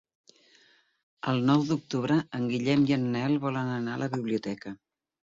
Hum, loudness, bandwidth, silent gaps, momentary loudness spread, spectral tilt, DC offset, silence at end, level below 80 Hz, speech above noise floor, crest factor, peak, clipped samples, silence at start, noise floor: none; -28 LUFS; 7.8 kHz; none; 12 LU; -7 dB/octave; under 0.1%; 0.65 s; -66 dBFS; 35 dB; 16 dB; -12 dBFS; under 0.1%; 1.25 s; -63 dBFS